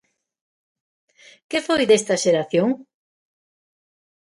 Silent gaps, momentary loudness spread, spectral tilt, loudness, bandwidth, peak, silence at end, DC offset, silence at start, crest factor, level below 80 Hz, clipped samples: none; 9 LU; -4 dB/octave; -20 LUFS; 11.5 kHz; -4 dBFS; 1.4 s; under 0.1%; 1.5 s; 18 dB; -66 dBFS; under 0.1%